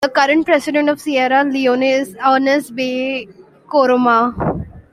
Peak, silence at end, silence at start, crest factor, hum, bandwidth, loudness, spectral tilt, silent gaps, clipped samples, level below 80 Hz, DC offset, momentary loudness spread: -2 dBFS; 0.1 s; 0 s; 14 dB; none; 15 kHz; -15 LUFS; -5 dB/octave; none; under 0.1%; -46 dBFS; under 0.1%; 8 LU